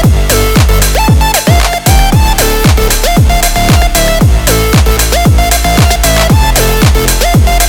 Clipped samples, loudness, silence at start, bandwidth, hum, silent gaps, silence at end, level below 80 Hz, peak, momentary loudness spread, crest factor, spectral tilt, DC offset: under 0.1%; -8 LUFS; 0 s; 19 kHz; none; none; 0 s; -10 dBFS; 0 dBFS; 1 LU; 6 dB; -4 dB/octave; under 0.1%